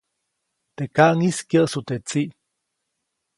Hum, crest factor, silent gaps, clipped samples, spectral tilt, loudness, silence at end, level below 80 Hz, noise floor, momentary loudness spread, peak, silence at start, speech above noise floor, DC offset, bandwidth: none; 22 dB; none; under 0.1%; -5.5 dB/octave; -21 LUFS; 1.05 s; -64 dBFS; -78 dBFS; 12 LU; 0 dBFS; 0.8 s; 58 dB; under 0.1%; 11.5 kHz